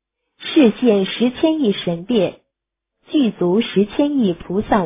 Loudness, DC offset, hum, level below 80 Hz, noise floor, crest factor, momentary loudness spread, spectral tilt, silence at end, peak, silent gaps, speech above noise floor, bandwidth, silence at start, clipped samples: -18 LUFS; under 0.1%; none; -48 dBFS; -80 dBFS; 16 dB; 8 LU; -11 dB/octave; 0 s; -2 dBFS; none; 64 dB; 3.9 kHz; 0.4 s; under 0.1%